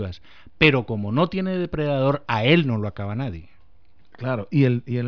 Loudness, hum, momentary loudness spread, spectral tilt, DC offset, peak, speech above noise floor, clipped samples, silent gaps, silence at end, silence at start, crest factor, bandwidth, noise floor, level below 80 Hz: -22 LUFS; none; 14 LU; -8.5 dB/octave; 0.6%; -4 dBFS; 37 dB; under 0.1%; none; 0 s; 0 s; 20 dB; 5.4 kHz; -59 dBFS; -48 dBFS